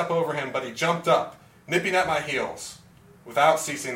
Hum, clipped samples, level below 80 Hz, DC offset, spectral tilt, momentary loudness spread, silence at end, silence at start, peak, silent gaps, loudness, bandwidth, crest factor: none; under 0.1%; -62 dBFS; under 0.1%; -3.5 dB/octave; 11 LU; 0 s; 0 s; -6 dBFS; none; -24 LUFS; 16.5 kHz; 18 dB